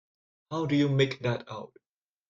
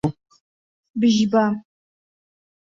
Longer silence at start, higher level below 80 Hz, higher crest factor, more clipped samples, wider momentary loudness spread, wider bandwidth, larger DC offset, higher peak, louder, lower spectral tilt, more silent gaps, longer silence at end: first, 0.5 s vs 0.05 s; second, -64 dBFS vs -56 dBFS; about the same, 18 dB vs 16 dB; neither; first, 17 LU vs 14 LU; about the same, 7.6 kHz vs 7.6 kHz; neither; second, -12 dBFS vs -8 dBFS; second, -28 LUFS vs -20 LUFS; about the same, -7 dB/octave vs -6 dB/octave; second, none vs 0.40-0.83 s, 0.90-0.94 s; second, 0.65 s vs 1.1 s